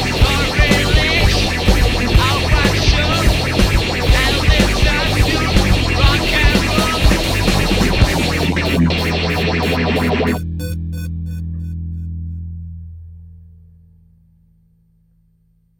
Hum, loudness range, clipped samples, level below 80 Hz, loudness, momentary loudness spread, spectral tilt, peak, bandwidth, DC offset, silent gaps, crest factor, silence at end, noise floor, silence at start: none; 14 LU; under 0.1%; -20 dBFS; -15 LUFS; 12 LU; -5 dB/octave; 0 dBFS; 17 kHz; under 0.1%; none; 14 dB; 2.35 s; -57 dBFS; 0 s